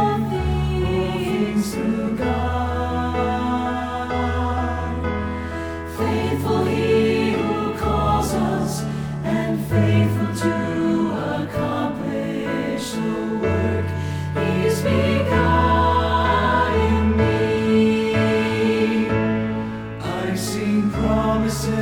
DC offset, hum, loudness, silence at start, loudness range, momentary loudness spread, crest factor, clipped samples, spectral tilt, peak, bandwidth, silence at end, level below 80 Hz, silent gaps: under 0.1%; none; -21 LUFS; 0 s; 5 LU; 7 LU; 14 dB; under 0.1%; -6.5 dB/octave; -6 dBFS; 18.5 kHz; 0 s; -34 dBFS; none